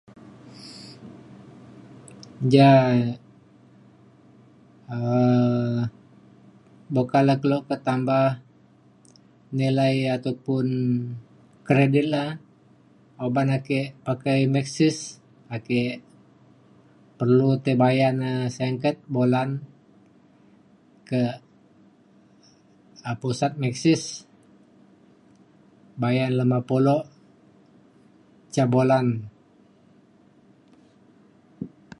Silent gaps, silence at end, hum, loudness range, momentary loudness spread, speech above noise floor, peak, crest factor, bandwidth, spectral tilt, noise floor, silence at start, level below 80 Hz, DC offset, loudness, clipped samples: none; 0.3 s; none; 6 LU; 20 LU; 35 dB; -2 dBFS; 22 dB; 11.5 kHz; -7 dB/octave; -56 dBFS; 0.2 s; -66 dBFS; under 0.1%; -23 LUFS; under 0.1%